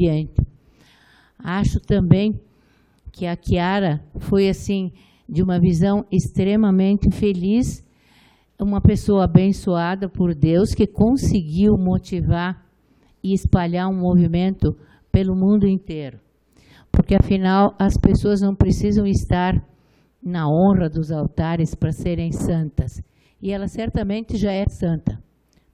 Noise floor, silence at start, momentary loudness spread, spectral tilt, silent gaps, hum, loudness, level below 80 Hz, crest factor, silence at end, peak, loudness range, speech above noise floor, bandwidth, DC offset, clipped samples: -57 dBFS; 0 s; 11 LU; -8 dB/octave; none; none; -19 LUFS; -32 dBFS; 20 dB; 0.55 s; 0 dBFS; 5 LU; 39 dB; 11.5 kHz; under 0.1%; under 0.1%